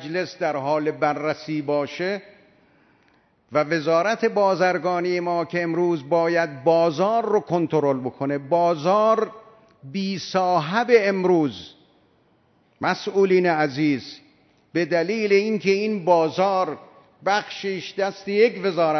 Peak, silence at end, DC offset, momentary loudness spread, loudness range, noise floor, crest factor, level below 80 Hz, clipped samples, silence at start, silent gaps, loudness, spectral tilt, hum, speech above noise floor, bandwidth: -4 dBFS; 0 s; under 0.1%; 9 LU; 3 LU; -61 dBFS; 18 dB; -72 dBFS; under 0.1%; 0 s; none; -22 LUFS; -6 dB/octave; none; 40 dB; 6.4 kHz